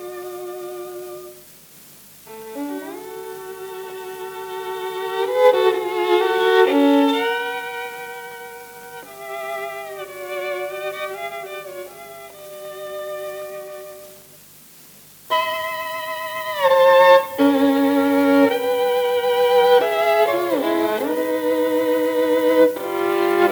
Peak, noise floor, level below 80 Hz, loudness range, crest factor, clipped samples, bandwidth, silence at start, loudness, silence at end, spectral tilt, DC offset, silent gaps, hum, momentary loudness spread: -2 dBFS; -46 dBFS; -68 dBFS; 17 LU; 18 dB; under 0.1%; over 20 kHz; 0 s; -19 LUFS; 0 s; -3.5 dB/octave; under 0.1%; none; 50 Hz at -60 dBFS; 20 LU